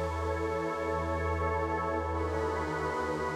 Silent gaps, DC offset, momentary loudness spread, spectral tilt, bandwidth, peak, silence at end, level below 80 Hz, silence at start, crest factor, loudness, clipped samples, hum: none; under 0.1%; 2 LU; -6.5 dB/octave; 12.5 kHz; -20 dBFS; 0 s; -42 dBFS; 0 s; 12 dB; -32 LUFS; under 0.1%; none